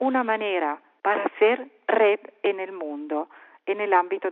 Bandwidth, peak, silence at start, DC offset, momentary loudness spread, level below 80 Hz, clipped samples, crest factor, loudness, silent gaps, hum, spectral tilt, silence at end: 4.1 kHz; -6 dBFS; 0 s; under 0.1%; 10 LU; -90 dBFS; under 0.1%; 18 dB; -25 LUFS; none; none; -1 dB/octave; 0 s